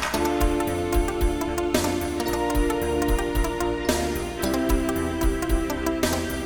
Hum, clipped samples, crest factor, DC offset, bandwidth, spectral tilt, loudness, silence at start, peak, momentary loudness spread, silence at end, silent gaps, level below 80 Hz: none; under 0.1%; 16 dB; 0.3%; 19 kHz; -5 dB/octave; -25 LUFS; 0 s; -8 dBFS; 2 LU; 0 s; none; -30 dBFS